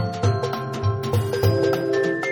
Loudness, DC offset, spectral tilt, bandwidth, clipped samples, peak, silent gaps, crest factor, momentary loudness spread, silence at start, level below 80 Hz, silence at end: -22 LUFS; under 0.1%; -6.5 dB/octave; 19 kHz; under 0.1%; -8 dBFS; none; 14 dB; 5 LU; 0 s; -48 dBFS; 0 s